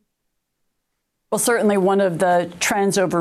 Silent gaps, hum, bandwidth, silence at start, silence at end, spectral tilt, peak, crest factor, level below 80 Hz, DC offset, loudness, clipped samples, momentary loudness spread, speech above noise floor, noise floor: none; none; 16 kHz; 1.3 s; 0 s; -4 dB/octave; -8 dBFS; 12 dB; -62 dBFS; under 0.1%; -18 LUFS; under 0.1%; 4 LU; 57 dB; -75 dBFS